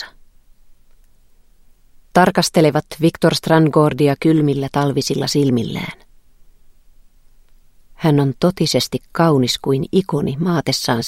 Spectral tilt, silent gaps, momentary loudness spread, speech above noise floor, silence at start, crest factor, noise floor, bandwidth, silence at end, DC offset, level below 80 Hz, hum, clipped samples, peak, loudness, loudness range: -5.5 dB/octave; none; 6 LU; 33 dB; 0 s; 18 dB; -49 dBFS; 16 kHz; 0 s; under 0.1%; -48 dBFS; none; under 0.1%; 0 dBFS; -16 LUFS; 7 LU